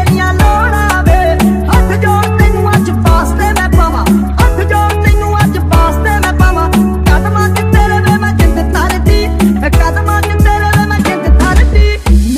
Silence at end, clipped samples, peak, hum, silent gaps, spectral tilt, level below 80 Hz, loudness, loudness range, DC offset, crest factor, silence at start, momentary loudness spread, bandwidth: 0 s; 0.4%; 0 dBFS; none; none; -6 dB/octave; -12 dBFS; -10 LUFS; 1 LU; under 0.1%; 8 dB; 0 s; 2 LU; 15.5 kHz